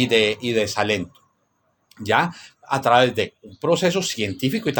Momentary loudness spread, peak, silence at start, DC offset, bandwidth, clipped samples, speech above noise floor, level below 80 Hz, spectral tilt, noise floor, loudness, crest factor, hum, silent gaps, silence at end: 10 LU; -2 dBFS; 0 s; under 0.1%; 19 kHz; under 0.1%; 47 dB; -60 dBFS; -4 dB/octave; -68 dBFS; -21 LUFS; 20 dB; none; none; 0 s